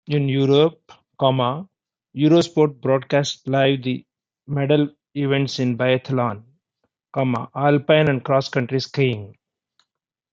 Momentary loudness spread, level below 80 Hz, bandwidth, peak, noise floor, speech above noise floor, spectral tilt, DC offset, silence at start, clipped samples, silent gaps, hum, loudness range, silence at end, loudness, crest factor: 10 LU; -64 dBFS; 7.8 kHz; -2 dBFS; -79 dBFS; 60 dB; -6.5 dB/octave; under 0.1%; 0.1 s; under 0.1%; none; none; 3 LU; 1 s; -20 LUFS; 18 dB